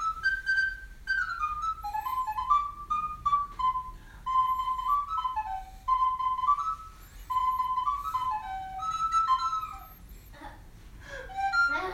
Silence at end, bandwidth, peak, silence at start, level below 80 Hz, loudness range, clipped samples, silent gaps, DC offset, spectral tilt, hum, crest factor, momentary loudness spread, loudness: 0 s; 16 kHz; -14 dBFS; 0 s; -50 dBFS; 2 LU; under 0.1%; none; under 0.1%; -2.5 dB/octave; none; 16 dB; 14 LU; -29 LUFS